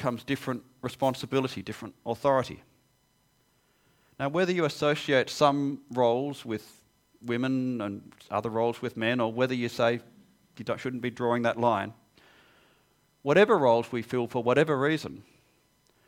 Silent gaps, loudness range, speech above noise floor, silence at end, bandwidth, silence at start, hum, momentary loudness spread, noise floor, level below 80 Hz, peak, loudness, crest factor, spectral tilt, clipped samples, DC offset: none; 5 LU; 41 dB; 0.85 s; 16.5 kHz; 0 s; none; 13 LU; -68 dBFS; -68 dBFS; -6 dBFS; -28 LUFS; 22 dB; -6 dB/octave; under 0.1%; under 0.1%